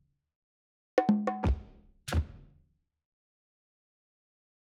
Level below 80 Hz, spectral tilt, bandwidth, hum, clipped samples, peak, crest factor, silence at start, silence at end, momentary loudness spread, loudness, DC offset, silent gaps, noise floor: -42 dBFS; -7 dB/octave; 13.5 kHz; none; under 0.1%; -10 dBFS; 24 dB; 0.95 s; 2.2 s; 13 LU; -31 LUFS; under 0.1%; none; -69 dBFS